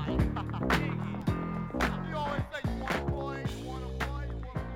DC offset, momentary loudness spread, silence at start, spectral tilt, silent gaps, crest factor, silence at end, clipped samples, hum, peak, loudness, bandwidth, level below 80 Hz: under 0.1%; 8 LU; 0 s; -6.5 dB/octave; none; 18 dB; 0 s; under 0.1%; none; -14 dBFS; -33 LUFS; 16.5 kHz; -40 dBFS